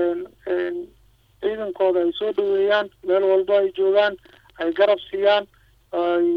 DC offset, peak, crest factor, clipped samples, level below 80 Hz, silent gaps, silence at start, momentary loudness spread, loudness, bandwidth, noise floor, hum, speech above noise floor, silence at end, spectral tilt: under 0.1%; -4 dBFS; 16 dB; under 0.1%; -60 dBFS; none; 0 s; 10 LU; -21 LUFS; 5.4 kHz; -56 dBFS; none; 37 dB; 0 s; -6 dB/octave